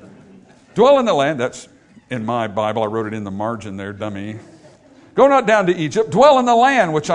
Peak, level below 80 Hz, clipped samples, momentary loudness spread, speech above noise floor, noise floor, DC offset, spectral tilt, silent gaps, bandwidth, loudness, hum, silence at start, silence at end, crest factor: 0 dBFS; -56 dBFS; under 0.1%; 16 LU; 30 dB; -46 dBFS; under 0.1%; -5.5 dB/octave; none; 10.5 kHz; -16 LUFS; none; 0.05 s; 0 s; 18 dB